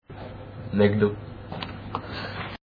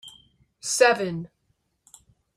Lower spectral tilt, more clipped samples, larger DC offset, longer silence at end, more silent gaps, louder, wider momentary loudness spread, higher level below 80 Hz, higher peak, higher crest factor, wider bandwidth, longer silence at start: first, -9 dB/octave vs -2.5 dB/octave; neither; neither; second, 0.1 s vs 1.1 s; neither; second, -27 LUFS vs -22 LUFS; about the same, 18 LU vs 18 LU; first, -48 dBFS vs -66 dBFS; about the same, -6 dBFS vs -4 dBFS; about the same, 22 dB vs 22 dB; second, 5.2 kHz vs 15.5 kHz; about the same, 0.1 s vs 0.05 s